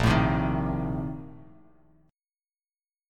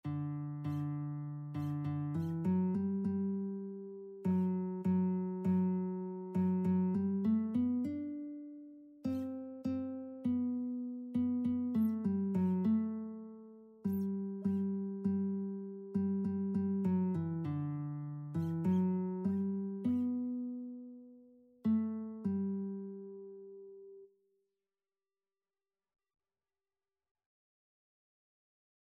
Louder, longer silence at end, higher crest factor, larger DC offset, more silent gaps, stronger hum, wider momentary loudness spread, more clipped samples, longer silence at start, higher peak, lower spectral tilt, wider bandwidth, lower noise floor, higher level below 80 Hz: first, -27 LUFS vs -36 LUFS; second, 1.65 s vs 4.85 s; first, 20 dB vs 14 dB; neither; neither; neither; first, 17 LU vs 14 LU; neither; about the same, 0 s vs 0.05 s; first, -10 dBFS vs -22 dBFS; second, -7 dB/octave vs -11 dB/octave; first, 13 kHz vs 3.4 kHz; about the same, under -90 dBFS vs under -90 dBFS; first, -40 dBFS vs -74 dBFS